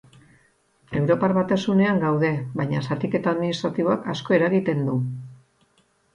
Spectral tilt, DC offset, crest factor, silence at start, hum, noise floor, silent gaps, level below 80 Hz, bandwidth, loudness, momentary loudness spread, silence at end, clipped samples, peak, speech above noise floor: -7.5 dB/octave; under 0.1%; 16 dB; 0.9 s; none; -64 dBFS; none; -60 dBFS; 9.4 kHz; -23 LUFS; 7 LU; 0.8 s; under 0.1%; -6 dBFS; 42 dB